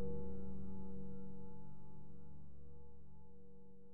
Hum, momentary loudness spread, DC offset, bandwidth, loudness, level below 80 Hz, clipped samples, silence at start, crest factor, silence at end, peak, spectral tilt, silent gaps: none; 14 LU; 0.9%; 2.3 kHz; -55 LUFS; -60 dBFS; under 0.1%; 0 s; 12 dB; 0 s; -30 dBFS; -11.5 dB/octave; none